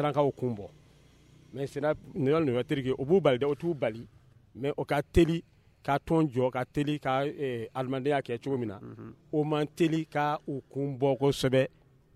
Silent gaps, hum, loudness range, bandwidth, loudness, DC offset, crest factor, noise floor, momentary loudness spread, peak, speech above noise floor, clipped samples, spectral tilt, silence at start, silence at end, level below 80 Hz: none; none; 2 LU; 14.5 kHz; -30 LUFS; under 0.1%; 20 dB; -59 dBFS; 12 LU; -10 dBFS; 30 dB; under 0.1%; -7 dB/octave; 0 s; 0.5 s; -50 dBFS